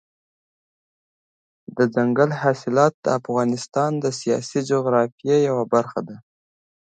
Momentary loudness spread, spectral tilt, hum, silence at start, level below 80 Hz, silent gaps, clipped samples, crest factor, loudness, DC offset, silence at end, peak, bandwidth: 5 LU; -6 dB/octave; none; 1.75 s; -68 dBFS; 2.94-3.03 s, 5.12-5.18 s; under 0.1%; 20 dB; -21 LUFS; under 0.1%; 0.65 s; -2 dBFS; 9.2 kHz